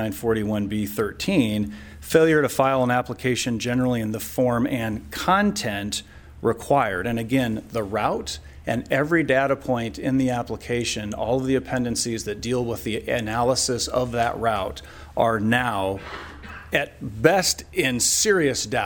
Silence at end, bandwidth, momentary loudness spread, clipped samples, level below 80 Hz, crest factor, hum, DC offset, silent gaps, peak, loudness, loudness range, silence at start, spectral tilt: 0 s; 19.5 kHz; 9 LU; under 0.1%; -46 dBFS; 20 dB; none; under 0.1%; none; -2 dBFS; -23 LUFS; 3 LU; 0 s; -4 dB/octave